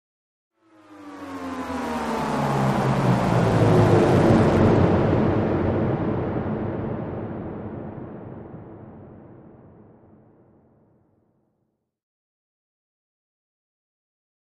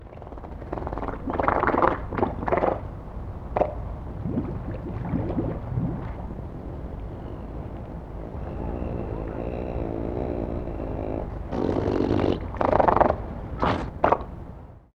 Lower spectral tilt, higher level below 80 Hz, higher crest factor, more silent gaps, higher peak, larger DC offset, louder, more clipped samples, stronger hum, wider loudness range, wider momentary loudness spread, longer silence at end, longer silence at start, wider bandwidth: about the same, -8 dB/octave vs -9 dB/octave; second, -44 dBFS vs -36 dBFS; about the same, 20 dB vs 24 dB; neither; about the same, -4 dBFS vs -4 dBFS; neither; first, -21 LUFS vs -28 LUFS; neither; neither; first, 19 LU vs 10 LU; first, 22 LU vs 14 LU; first, 5.15 s vs 0.15 s; first, 0.9 s vs 0 s; first, 13.5 kHz vs 7 kHz